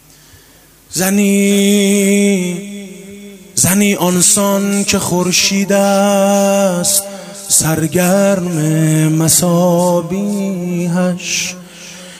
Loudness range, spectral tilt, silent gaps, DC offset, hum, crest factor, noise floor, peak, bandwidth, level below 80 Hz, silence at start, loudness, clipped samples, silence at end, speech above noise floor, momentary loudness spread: 3 LU; -4 dB/octave; none; under 0.1%; none; 14 dB; -44 dBFS; 0 dBFS; 16 kHz; -48 dBFS; 0.9 s; -12 LUFS; under 0.1%; 0 s; 32 dB; 12 LU